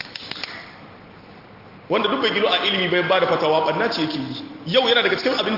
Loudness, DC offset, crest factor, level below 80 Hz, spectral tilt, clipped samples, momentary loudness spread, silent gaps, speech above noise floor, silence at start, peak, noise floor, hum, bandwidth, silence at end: -20 LUFS; under 0.1%; 18 dB; -62 dBFS; -5 dB/octave; under 0.1%; 14 LU; none; 24 dB; 0 s; -4 dBFS; -43 dBFS; none; 5.8 kHz; 0 s